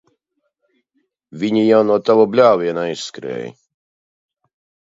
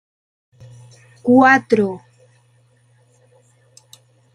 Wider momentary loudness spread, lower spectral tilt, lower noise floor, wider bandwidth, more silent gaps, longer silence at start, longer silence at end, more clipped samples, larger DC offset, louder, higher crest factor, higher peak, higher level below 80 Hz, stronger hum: about the same, 15 LU vs 15 LU; about the same, -6 dB/octave vs -6 dB/octave; first, -72 dBFS vs -56 dBFS; second, 7.8 kHz vs 10.5 kHz; neither; about the same, 1.35 s vs 1.25 s; second, 1.35 s vs 2.35 s; neither; neither; about the same, -16 LUFS vs -14 LUFS; about the same, 18 dB vs 20 dB; about the same, 0 dBFS vs -2 dBFS; about the same, -66 dBFS vs -64 dBFS; neither